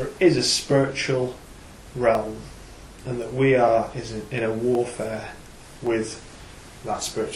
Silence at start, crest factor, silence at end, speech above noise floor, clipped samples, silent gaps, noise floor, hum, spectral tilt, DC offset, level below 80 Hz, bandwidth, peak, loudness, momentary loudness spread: 0 s; 18 dB; 0 s; 21 dB; under 0.1%; none; -43 dBFS; none; -4.5 dB/octave; under 0.1%; -48 dBFS; 13.5 kHz; -6 dBFS; -23 LUFS; 24 LU